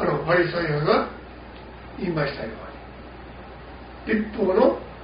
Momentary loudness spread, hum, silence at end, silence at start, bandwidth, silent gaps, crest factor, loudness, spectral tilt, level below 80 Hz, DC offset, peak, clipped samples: 21 LU; none; 0 s; 0 s; 5.2 kHz; none; 20 dB; -23 LUFS; -5 dB/octave; -46 dBFS; under 0.1%; -4 dBFS; under 0.1%